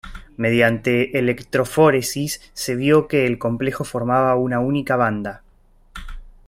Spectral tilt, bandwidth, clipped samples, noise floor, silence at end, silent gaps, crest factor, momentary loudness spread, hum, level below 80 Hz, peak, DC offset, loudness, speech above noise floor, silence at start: -5.5 dB/octave; 16 kHz; under 0.1%; -52 dBFS; 0.15 s; none; 18 dB; 12 LU; none; -42 dBFS; -2 dBFS; under 0.1%; -19 LUFS; 34 dB; 0.05 s